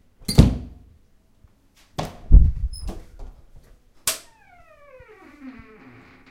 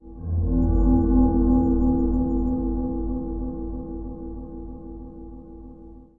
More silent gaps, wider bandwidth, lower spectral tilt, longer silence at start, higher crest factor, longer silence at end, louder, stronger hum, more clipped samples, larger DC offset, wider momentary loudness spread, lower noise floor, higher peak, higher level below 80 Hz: neither; first, 16 kHz vs 1.6 kHz; second, -5.5 dB/octave vs -14 dB/octave; first, 0.3 s vs 0.05 s; first, 22 dB vs 16 dB; first, 0.8 s vs 0.15 s; about the same, -21 LUFS vs -23 LUFS; neither; neither; neither; first, 25 LU vs 21 LU; first, -56 dBFS vs -44 dBFS; first, 0 dBFS vs -8 dBFS; about the same, -24 dBFS vs -28 dBFS